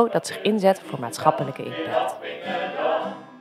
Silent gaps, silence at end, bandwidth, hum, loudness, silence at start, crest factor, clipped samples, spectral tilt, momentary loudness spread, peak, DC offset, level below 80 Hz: none; 0 s; 15 kHz; none; -25 LUFS; 0 s; 22 dB; under 0.1%; -5 dB/octave; 10 LU; -2 dBFS; under 0.1%; -76 dBFS